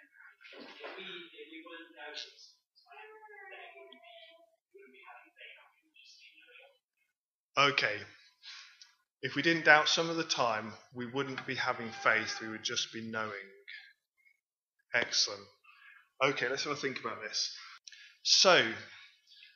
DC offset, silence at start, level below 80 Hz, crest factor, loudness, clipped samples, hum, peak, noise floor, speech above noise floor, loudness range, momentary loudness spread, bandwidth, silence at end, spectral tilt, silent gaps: under 0.1%; 0.45 s; -90 dBFS; 28 dB; -30 LUFS; under 0.1%; none; -6 dBFS; -88 dBFS; 56 dB; 20 LU; 27 LU; 7.6 kHz; 0.5 s; -2 dB/octave; 6.83-6.88 s, 7.17-7.50 s, 14.46-14.50 s, 14.63-14.68 s